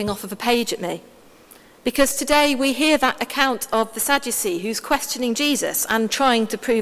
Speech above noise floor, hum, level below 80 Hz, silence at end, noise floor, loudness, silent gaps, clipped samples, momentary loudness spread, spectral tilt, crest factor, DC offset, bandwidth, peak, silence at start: 28 dB; none; -50 dBFS; 0 s; -48 dBFS; -20 LUFS; none; under 0.1%; 8 LU; -2 dB/octave; 20 dB; under 0.1%; 16 kHz; 0 dBFS; 0 s